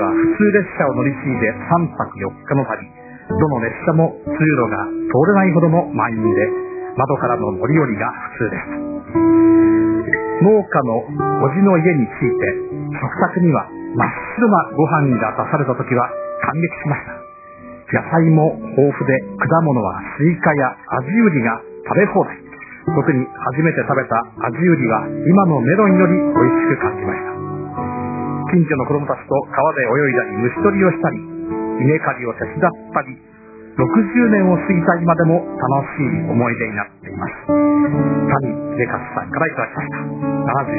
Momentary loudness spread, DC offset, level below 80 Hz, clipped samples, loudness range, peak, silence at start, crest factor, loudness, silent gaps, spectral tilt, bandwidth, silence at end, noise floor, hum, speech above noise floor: 11 LU; under 0.1%; -48 dBFS; under 0.1%; 4 LU; 0 dBFS; 0 s; 16 dB; -17 LUFS; none; -14.5 dB/octave; 2.7 kHz; 0 s; -37 dBFS; none; 21 dB